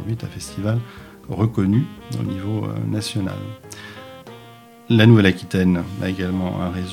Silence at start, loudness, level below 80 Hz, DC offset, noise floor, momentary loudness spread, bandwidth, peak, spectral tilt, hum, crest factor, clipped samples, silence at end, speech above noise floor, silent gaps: 0 s; -20 LUFS; -50 dBFS; under 0.1%; -44 dBFS; 22 LU; 14.5 kHz; 0 dBFS; -7 dB/octave; none; 20 dB; under 0.1%; 0 s; 24 dB; none